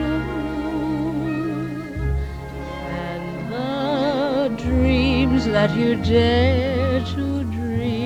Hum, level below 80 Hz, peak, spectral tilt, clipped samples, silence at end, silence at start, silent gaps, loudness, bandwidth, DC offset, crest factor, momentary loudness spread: none; -32 dBFS; -4 dBFS; -7.5 dB/octave; under 0.1%; 0 s; 0 s; none; -21 LUFS; 11 kHz; under 0.1%; 16 dB; 11 LU